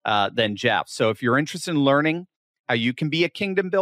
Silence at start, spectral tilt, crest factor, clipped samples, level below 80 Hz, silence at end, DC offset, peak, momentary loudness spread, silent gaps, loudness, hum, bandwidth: 0.05 s; -5 dB/octave; 16 dB; under 0.1%; -68 dBFS; 0 s; under 0.1%; -8 dBFS; 6 LU; 2.36-2.64 s; -22 LUFS; none; 15 kHz